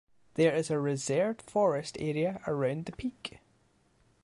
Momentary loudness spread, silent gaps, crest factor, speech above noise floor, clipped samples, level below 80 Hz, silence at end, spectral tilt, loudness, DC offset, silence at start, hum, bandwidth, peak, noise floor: 11 LU; none; 18 dB; 38 dB; under 0.1%; -64 dBFS; 0.95 s; -5.5 dB/octave; -31 LUFS; under 0.1%; 0.35 s; none; 11.5 kHz; -14 dBFS; -68 dBFS